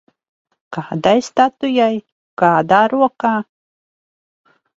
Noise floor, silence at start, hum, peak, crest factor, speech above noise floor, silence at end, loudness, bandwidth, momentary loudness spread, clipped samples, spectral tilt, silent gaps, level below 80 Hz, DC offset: under -90 dBFS; 0.7 s; none; 0 dBFS; 18 dB; over 75 dB; 1.35 s; -16 LUFS; 8 kHz; 16 LU; under 0.1%; -5.5 dB/octave; 2.12-2.37 s; -60 dBFS; under 0.1%